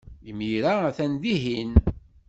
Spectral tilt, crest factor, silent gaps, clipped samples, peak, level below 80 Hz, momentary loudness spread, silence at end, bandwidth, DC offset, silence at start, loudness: -7.5 dB/octave; 22 dB; none; under 0.1%; -2 dBFS; -32 dBFS; 10 LU; 0.3 s; 8 kHz; under 0.1%; 0.1 s; -25 LUFS